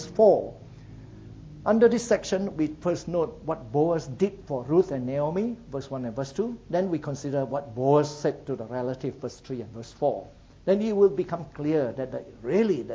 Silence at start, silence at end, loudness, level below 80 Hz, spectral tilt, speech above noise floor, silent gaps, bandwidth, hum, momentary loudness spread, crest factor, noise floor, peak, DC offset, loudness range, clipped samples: 0 s; 0 s; -27 LUFS; -54 dBFS; -7 dB/octave; 19 dB; none; 8 kHz; none; 15 LU; 20 dB; -45 dBFS; -6 dBFS; under 0.1%; 3 LU; under 0.1%